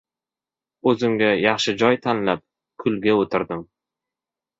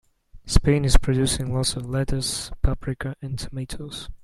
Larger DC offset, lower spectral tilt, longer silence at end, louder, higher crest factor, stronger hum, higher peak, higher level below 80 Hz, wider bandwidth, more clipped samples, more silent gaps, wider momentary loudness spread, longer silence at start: neither; about the same, -5 dB/octave vs -5 dB/octave; first, 0.95 s vs 0.1 s; first, -21 LUFS vs -25 LUFS; about the same, 20 dB vs 22 dB; neither; about the same, -2 dBFS vs 0 dBFS; second, -60 dBFS vs -26 dBFS; second, 8 kHz vs 13 kHz; neither; neither; second, 9 LU vs 12 LU; first, 0.85 s vs 0.35 s